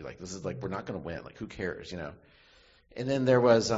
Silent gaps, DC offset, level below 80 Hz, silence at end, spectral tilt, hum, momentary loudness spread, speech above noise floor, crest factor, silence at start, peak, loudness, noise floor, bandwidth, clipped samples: none; under 0.1%; -56 dBFS; 0 s; -5.5 dB/octave; none; 18 LU; 30 dB; 20 dB; 0 s; -10 dBFS; -31 LUFS; -60 dBFS; 8 kHz; under 0.1%